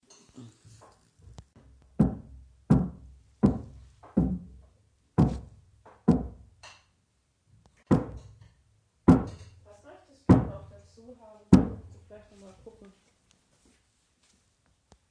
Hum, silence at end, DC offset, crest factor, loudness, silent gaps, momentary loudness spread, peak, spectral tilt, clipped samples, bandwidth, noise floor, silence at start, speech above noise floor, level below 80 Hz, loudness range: none; 2.4 s; under 0.1%; 28 dB; -26 LUFS; none; 27 LU; -2 dBFS; -9 dB/octave; under 0.1%; 10 kHz; -72 dBFS; 0.4 s; 44 dB; -44 dBFS; 5 LU